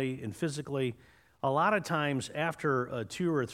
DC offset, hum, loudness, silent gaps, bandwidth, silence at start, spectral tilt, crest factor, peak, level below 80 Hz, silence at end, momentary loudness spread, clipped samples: under 0.1%; none; -32 LUFS; none; 16 kHz; 0 s; -5.5 dB/octave; 18 dB; -14 dBFS; -68 dBFS; 0 s; 8 LU; under 0.1%